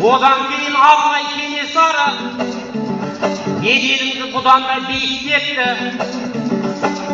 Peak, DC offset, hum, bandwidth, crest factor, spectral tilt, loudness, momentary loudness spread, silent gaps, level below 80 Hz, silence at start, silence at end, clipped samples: 0 dBFS; under 0.1%; none; 7.8 kHz; 16 dB; -1 dB/octave; -15 LUFS; 10 LU; none; -54 dBFS; 0 s; 0 s; under 0.1%